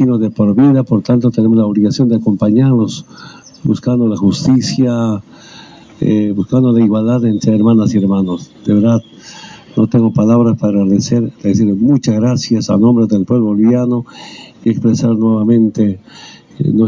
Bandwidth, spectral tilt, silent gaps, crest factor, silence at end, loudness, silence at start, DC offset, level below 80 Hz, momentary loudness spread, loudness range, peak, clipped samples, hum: 7.6 kHz; -7.5 dB/octave; none; 10 dB; 0 s; -12 LUFS; 0 s; under 0.1%; -46 dBFS; 9 LU; 2 LU; -2 dBFS; under 0.1%; none